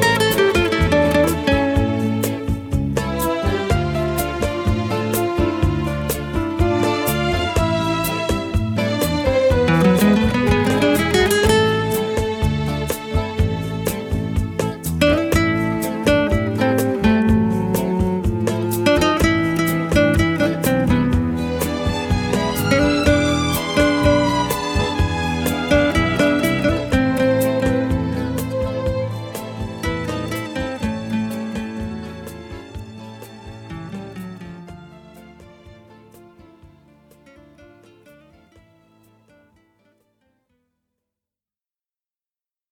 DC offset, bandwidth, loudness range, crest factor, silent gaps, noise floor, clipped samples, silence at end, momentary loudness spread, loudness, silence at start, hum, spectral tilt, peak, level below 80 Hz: under 0.1%; 19 kHz; 11 LU; 18 dB; none; under -90 dBFS; under 0.1%; 6.05 s; 12 LU; -19 LUFS; 0 s; none; -5.5 dB/octave; -2 dBFS; -32 dBFS